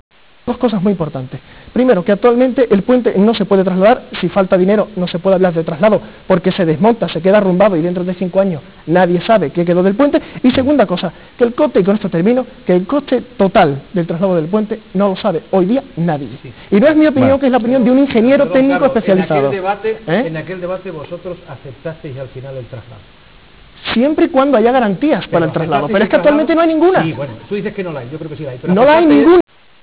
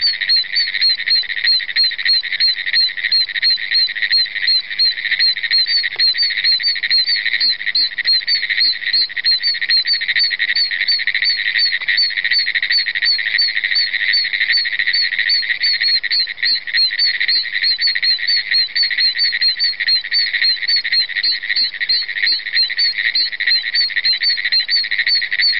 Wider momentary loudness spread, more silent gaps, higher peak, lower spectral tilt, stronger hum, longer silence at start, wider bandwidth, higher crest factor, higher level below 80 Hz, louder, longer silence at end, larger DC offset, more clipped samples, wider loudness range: first, 15 LU vs 2 LU; neither; about the same, -2 dBFS vs -4 dBFS; first, -11 dB/octave vs -2 dB/octave; neither; first, 0.45 s vs 0 s; second, 4 kHz vs 5.8 kHz; about the same, 10 dB vs 12 dB; first, -44 dBFS vs -62 dBFS; about the same, -13 LUFS vs -13 LUFS; first, 0.4 s vs 0 s; second, 0.4% vs 0.9%; neither; first, 6 LU vs 1 LU